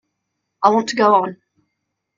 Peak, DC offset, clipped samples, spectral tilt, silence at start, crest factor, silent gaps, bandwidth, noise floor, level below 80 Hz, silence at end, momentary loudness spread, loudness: 0 dBFS; under 0.1%; under 0.1%; -4.5 dB/octave; 0.6 s; 20 dB; none; 9 kHz; -76 dBFS; -66 dBFS; 0.85 s; 5 LU; -16 LUFS